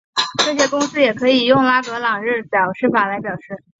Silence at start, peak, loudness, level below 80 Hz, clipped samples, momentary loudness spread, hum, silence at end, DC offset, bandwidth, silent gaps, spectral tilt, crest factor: 0.15 s; -2 dBFS; -16 LUFS; -60 dBFS; under 0.1%; 7 LU; none; 0.25 s; under 0.1%; 8 kHz; none; -3.5 dB/octave; 16 dB